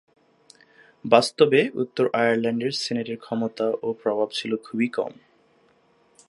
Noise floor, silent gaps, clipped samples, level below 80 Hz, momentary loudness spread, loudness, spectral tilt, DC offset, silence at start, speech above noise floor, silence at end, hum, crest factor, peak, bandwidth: -61 dBFS; none; under 0.1%; -74 dBFS; 10 LU; -23 LUFS; -5 dB/octave; under 0.1%; 1.05 s; 38 dB; 1.15 s; none; 24 dB; -2 dBFS; 11.5 kHz